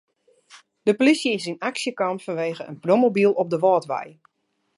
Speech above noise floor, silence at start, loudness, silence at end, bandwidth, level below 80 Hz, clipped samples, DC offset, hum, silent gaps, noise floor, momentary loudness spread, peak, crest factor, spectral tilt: 52 dB; 0.55 s; -22 LUFS; 0.7 s; 11.5 kHz; -76 dBFS; under 0.1%; under 0.1%; none; none; -73 dBFS; 11 LU; -4 dBFS; 18 dB; -5 dB/octave